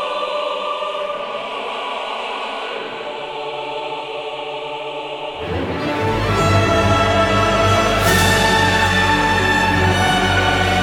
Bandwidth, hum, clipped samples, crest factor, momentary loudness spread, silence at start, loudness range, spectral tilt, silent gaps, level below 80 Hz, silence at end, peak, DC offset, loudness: 19 kHz; none; under 0.1%; 16 dB; 12 LU; 0 s; 11 LU; -4.5 dB/octave; none; -34 dBFS; 0 s; -2 dBFS; under 0.1%; -18 LUFS